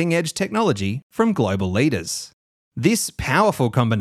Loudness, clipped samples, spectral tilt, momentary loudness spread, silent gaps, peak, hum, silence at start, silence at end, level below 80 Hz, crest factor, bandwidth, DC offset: -21 LUFS; under 0.1%; -5 dB/octave; 9 LU; 1.03-1.10 s, 2.33-2.72 s; -4 dBFS; none; 0 s; 0 s; -46 dBFS; 16 dB; 15.5 kHz; under 0.1%